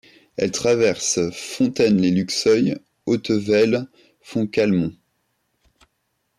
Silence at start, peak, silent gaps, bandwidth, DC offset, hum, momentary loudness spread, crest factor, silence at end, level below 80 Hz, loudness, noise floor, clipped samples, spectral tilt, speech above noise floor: 0.4 s; -8 dBFS; none; 13.5 kHz; under 0.1%; none; 9 LU; 14 dB; 1.45 s; -58 dBFS; -20 LUFS; -72 dBFS; under 0.1%; -5 dB/octave; 53 dB